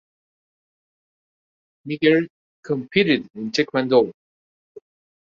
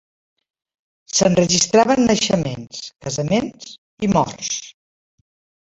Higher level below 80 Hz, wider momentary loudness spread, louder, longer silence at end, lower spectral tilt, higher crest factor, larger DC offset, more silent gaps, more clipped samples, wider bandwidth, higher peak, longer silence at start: second, -66 dBFS vs -50 dBFS; second, 12 LU vs 16 LU; about the same, -20 LUFS vs -18 LUFS; first, 1.1 s vs 0.95 s; first, -5.5 dB/octave vs -4 dB/octave; about the same, 20 dB vs 18 dB; neither; first, 2.30-2.63 s, 3.30-3.34 s vs 3.78-3.98 s; neither; second, 7.6 kHz vs 8.4 kHz; about the same, -4 dBFS vs -2 dBFS; first, 1.85 s vs 1.1 s